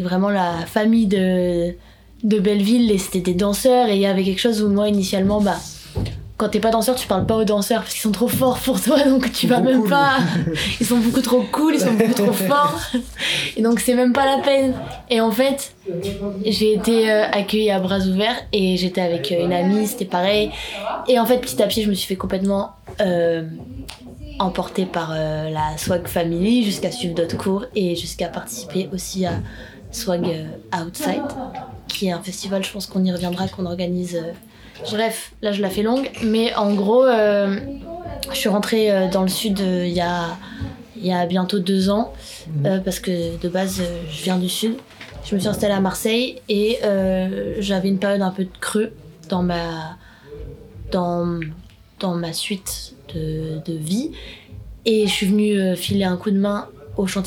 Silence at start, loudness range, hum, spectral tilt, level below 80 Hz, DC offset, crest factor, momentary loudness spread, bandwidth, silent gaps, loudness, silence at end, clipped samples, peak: 0 s; 7 LU; none; -5 dB/octave; -44 dBFS; under 0.1%; 18 dB; 12 LU; 20 kHz; none; -20 LUFS; 0 s; under 0.1%; -2 dBFS